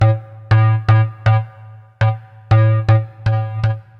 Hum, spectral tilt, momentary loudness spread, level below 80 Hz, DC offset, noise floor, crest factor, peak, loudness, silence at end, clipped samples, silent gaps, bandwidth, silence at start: none; -8.5 dB/octave; 7 LU; -38 dBFS; under 0.1%; -39 dBFS; 12 dB; -2 dBFS; -16 LUFS; 0.2 s; under 0.1%; none; 5.4 kHz; 0 s